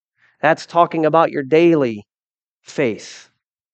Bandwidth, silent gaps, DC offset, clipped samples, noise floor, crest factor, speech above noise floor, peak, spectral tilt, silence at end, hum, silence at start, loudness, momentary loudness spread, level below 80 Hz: 8.4 kHz; 2.27-2.35 s, 2.42-2.61 s; under 0.1%; under 0.1%; under -90 dBFS; 18 dB; over 74 dB; 0 dBFS; -6.5 dB/octave; 0.55 s; none; 0.45 s; -17 LUFS; 17 LU; -72 dBFS